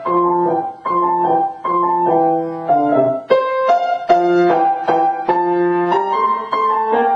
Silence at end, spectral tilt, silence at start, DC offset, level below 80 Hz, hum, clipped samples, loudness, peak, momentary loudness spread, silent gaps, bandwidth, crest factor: 0 s; -7.5 dB/octave; 0 s; under 0.1%; -62 dBFS; none; under 0.1%; -16 LUFS; -2 dBFS; 4 LU; none; 7.2 kHz; 14 dB